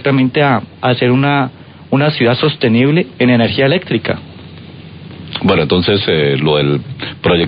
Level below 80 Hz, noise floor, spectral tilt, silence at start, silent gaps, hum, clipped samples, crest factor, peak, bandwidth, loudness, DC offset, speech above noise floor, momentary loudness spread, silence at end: -40 dBFS; -33 dBFS; -10 dB/octave; 0 s; none; none; under 0.1%; 14 dB; 0 dBFS; 5.2 kHz; -13 LUFS; under 0.1%; 20 dB; 20 LU; 0 s